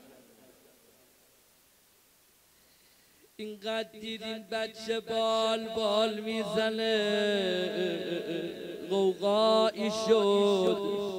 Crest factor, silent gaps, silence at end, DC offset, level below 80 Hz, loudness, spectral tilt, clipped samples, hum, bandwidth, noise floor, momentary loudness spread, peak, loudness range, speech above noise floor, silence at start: 18 dB; none; 0 s; under 0.1%; -72 dBFS; -29 LUFS; -4.5 dB/octave; under 0.1%; none; 16 kHz; -64 dBFS; 12 LU; -12 dBFS; 13 LU; 35 dB; 3.4 s